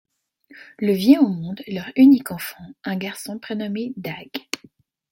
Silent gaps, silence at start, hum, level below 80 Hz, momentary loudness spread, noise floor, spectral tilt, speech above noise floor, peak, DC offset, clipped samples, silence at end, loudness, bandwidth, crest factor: none; 0.8 s; none; -64 dBFS; 18 LU; -54 dBFS; -6 dB/octave; 34 dB; -2 dBFS; under 0.1%; under 0.1%; 0.55 s; -20 LUFS; 17 kHz; 20 dB